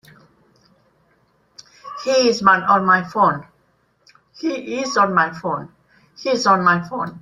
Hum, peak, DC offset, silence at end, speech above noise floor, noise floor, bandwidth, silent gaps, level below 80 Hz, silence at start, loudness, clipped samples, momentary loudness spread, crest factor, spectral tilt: none; -2 dBFS; under 0.1%; 0.05 s; 44 dB; -62 dBFS; 12 kHz; none; -62 dBFS; 1.85 s; -18 LUFS; under 0.1%; 14 LU; 18 dB; -4.5 dB/octave